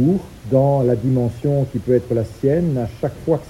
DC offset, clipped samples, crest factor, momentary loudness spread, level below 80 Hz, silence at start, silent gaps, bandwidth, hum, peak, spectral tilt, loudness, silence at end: under 0.1%; under 0.1%; 14 dB; 7 LU; -42 dBFS; 0 s; none; 12.5 kHz; none; -4 dBFS; -9.5 dB/octave; -19 LUFS; 0 s